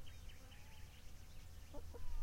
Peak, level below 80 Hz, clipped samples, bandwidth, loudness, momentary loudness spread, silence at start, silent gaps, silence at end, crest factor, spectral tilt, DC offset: -32 dBFS; -52 dBFS; under 0.1%; 16.5 kHz; -58 LUFS; 5 LU; 0 s; none; 0 s; 14 dB; -4.5 dB/octave; under 0.1%